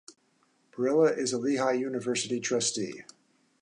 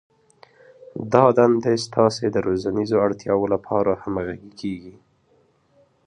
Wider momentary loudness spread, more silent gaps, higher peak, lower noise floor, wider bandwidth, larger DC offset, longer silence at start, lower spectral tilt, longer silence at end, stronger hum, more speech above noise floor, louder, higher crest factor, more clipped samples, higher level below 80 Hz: second, 12 LU vs 15 LU; neither; second, -12 dBFS vs 0 dBFS; first, -69 dBFS vs -61 dBFS; about the same, 11 kHz vs 10.5 kHz; neither; second, 0.1 s vs 0.95 s; second, -3.5 dB/octave vs -6.5 dB/octave; second, 0.6 s vs 1.15 s; neither; about the same, 41 dB vs 41 dB; second, -28 LUFS vs -21 LUFS; about the same, 18 dB vs 22 dB; neither; second, -80 dBFS vs -54 dBFS